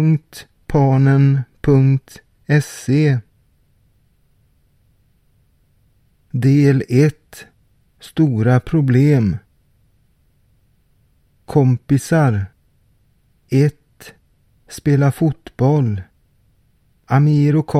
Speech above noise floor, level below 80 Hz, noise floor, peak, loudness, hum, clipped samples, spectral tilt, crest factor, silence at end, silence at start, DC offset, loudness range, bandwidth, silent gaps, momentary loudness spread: 43 dB; -46 dBFS; -58 dBFS; -2 dBFS; -16 LUFS; none; under 0.1%; -8 dB/octave; 16 dB; 0 s; 0 s; under 0.1%; 6 LU; 14 kHz; none; 12 LU